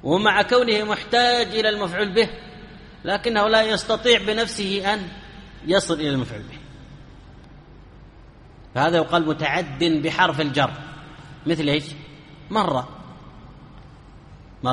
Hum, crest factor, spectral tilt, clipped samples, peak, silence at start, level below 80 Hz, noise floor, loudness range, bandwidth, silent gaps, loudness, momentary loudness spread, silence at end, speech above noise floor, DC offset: none; 20 dB; -4.5 dB/octave; under 0.1%; -2 dBFS; 0.05 s; -48 dBFS; -46 dBFS; 7 LU; 11.5 kHz; none; -21 LUFS; 22 LU; 0 s; 25 dB; under 0.1%